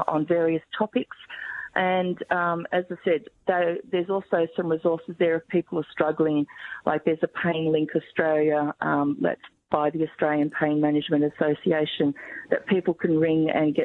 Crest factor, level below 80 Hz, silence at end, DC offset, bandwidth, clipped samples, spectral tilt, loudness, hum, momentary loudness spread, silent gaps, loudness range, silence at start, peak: 18 dB; -68 dBFS; 0 s; under 0.1%; 4.1 kHz; under 0.1%; -9 dB/octave; -25 LUFS; none; 6 LU; none; 2 LU; 0 s; -6 dBFS